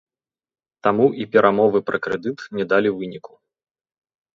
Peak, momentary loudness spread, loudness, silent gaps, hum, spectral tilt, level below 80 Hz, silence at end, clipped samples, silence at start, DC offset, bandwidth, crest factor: -2 dBFS; 12 LU; -20 LUFS; none; none; -7.5 dB/octave; -64 dBFS; 1.15 s; under 0.1%; 0.85 s; under 0.1%; 7 kHz; 20 dB